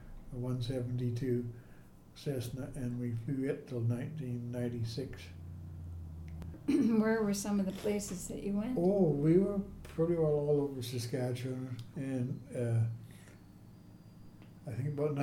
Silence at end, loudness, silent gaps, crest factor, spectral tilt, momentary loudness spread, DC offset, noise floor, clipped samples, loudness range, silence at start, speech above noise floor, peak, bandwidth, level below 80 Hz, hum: 0 s; -35 LUFS; none; 18 dB; -7 dB/octave; 17 LU; under 0.1%; -55 dBFS; under 0.1%; 7 LU; 0 s; 21 dB; -16 dBFS; 16.5 kHz; -56 dBFS; none